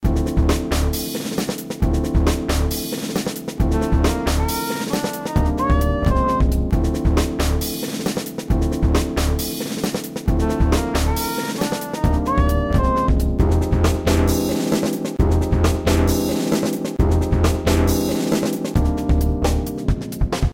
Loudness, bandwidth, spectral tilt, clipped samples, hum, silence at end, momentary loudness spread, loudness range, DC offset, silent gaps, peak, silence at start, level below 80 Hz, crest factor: -20 LUFS; 17 kHz; -6 dB/octave; under 0.1%; none; 0 s; 6 LU; 3 LU; under 0.1%; none; -4 dBFS; 0 s; -22 dBFS; 14 dB